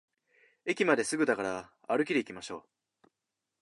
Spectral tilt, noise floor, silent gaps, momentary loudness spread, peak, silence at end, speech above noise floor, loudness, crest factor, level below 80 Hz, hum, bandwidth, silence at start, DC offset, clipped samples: -4 dB/octave; -87 dBFS; none; 15 LU; -10 dBFS; 1 s; 56 dB; -31 LUFS; 22 dB; -76 dBFS; none; 11.5 kHz; 0.65 s; under 0.1%; under 0.1%